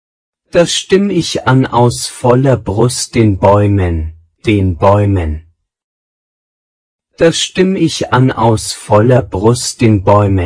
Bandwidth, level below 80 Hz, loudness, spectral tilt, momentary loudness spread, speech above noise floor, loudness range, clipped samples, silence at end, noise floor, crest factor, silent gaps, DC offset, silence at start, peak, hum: 10.5 kHz; -32 dBFS; -11 LUFS; -5.5 dB/octave; 6 LU; over 80 dB; 5 LU; 0.8%; 0 s; under -90 dBFS; 12 dB; 5.84-6.99 s; under 0.1%; 0.55 s; 0 dBFS; none